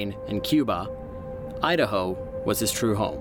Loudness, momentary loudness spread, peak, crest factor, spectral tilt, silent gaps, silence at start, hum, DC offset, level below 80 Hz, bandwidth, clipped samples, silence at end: -26 LUFS; 13 LU; -8 dBFS; 18 dB; -4.5 dB/octave; none; 0 s; none; under 0.1%; -46 dBFS; 19 kHz; under 0.1%; 0 s